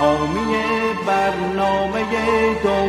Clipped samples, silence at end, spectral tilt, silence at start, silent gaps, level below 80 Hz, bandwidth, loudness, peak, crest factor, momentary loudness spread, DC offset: under 0.1%; 0 s; -5.5 dB/octave; 0 s; none; -42 dBFS; 13.5 kHz; -19 LUFS; -4 dBFS; 14 dB; 3 LU; under 0.1%